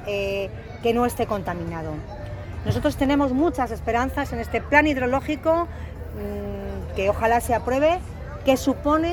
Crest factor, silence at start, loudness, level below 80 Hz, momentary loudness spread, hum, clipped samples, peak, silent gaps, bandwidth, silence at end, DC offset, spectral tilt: 20 dB; 0 s; -23 LUFS; -36 dBFS; 13 LU; none; under 0.1%; -2 dBFS; none; 19 kHz; 0 s; under 0.1%; -6 dB/octave